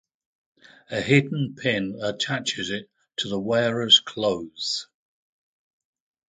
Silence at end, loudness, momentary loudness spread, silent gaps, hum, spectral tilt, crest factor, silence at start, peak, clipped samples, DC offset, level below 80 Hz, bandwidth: 1.45 s; -23 LUFS; 14 LU; none; none; -4 dB/octave; 22 dB; 0.9 s; -4 dBFS; under 0.1%; under 0.1%; -62 dBFS; 9.6 kHz